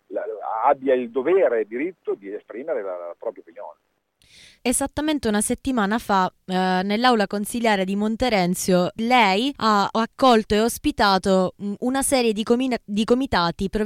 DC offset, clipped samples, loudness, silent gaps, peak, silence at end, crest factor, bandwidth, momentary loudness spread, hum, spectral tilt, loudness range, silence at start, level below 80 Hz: under 0.1%; under 0.1%; -21 LUFS; none; -6 dBFS; 0 s; 16 dB; 16 kHz; 12 LU; none; -4.5 dB/octave; 7 LU; 0.1 s; -46 dBFS